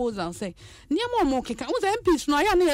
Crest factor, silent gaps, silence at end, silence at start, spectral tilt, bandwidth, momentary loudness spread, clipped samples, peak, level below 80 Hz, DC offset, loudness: 12 dB; none; 0 s; 0 s; -4 dB/octave; 16 kHz; 10 LU; under 0.1%; -12 dBFS; -46 dBFS; under 0.1%; -25 LUFS